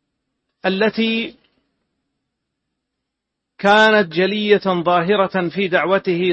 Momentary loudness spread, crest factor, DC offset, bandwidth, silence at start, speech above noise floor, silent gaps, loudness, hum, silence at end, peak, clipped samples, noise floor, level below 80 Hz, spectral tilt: 9 LU; 18 dB; under 0.1%; 8.6 kHz; 0.65 s; 63 dB; none; -17 LUFS; none; 0 s; 0 dBFS; under 0.1%; -79 dBFS; -62 dBFS; -6 dB/octave